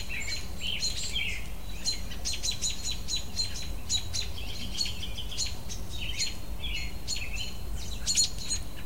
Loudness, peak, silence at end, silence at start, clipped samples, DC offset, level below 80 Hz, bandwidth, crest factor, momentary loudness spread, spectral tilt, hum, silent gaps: -32 LUFS; -12 dBFS; 0 s; 0 s; under 0.1%; 2%; -40 dBFS; 16 kHz; 20 dB; 9 LU; -1 dB/octave; none; none